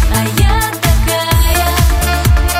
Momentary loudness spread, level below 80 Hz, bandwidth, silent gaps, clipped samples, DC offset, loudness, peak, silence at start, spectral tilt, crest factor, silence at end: 2 LU; -14 dBFS; 16.5 kHz; none; under 0.1%; under 0.1%; -12 LUFS; 0 dBFS; 0 s; -4 dB/octave; 10 dB; 0 s